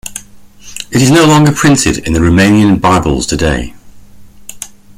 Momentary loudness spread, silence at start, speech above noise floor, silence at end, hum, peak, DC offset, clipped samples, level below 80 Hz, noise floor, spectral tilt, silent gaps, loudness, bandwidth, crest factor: 20 LU; 0.05 s; 29 dB; 0.3 s; none; 0 dBFS; under 0.1%; under 0.1%; -28 dBFS; -37 dBFS; -5 dB/octave; none; -9 LUFS; 16 kHz; 10 dB